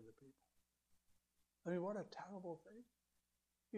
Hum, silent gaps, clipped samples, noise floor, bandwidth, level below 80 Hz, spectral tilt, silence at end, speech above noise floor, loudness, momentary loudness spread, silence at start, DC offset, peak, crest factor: 60 Hz at -75 dBFS; none; under 0.1%; -89 dBFS; 12.5 kHz; -88 dBFS; -7.5 dB/octave; 0 s; 40 dB; -49 LUFS; 21 LU; 0 s; under 0.1%; -34 dBFS; 20 dB